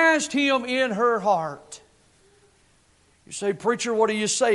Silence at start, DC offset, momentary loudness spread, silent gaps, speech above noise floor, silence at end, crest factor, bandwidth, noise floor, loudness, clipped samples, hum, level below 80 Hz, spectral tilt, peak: 0 s; under 0.1%; 17 LU; none; 38 dB; 0 s; 16 dB; 11.5 kHz; -60 dBFS; -23 LUFS; under 0.1%; none; -66 dBFS; -3 dB/octave; -8 dBFS